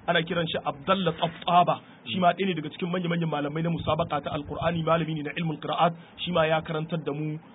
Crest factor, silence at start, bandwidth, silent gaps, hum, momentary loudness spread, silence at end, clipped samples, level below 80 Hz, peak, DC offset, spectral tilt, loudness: 18 dB; 0.05 s; 4 kHz; none; none; 8 LU; 0 s; under 0.1%; -54 dBFS; -8 dBFS; under 0.1%; -10.5 dB/octave; -27 LUFS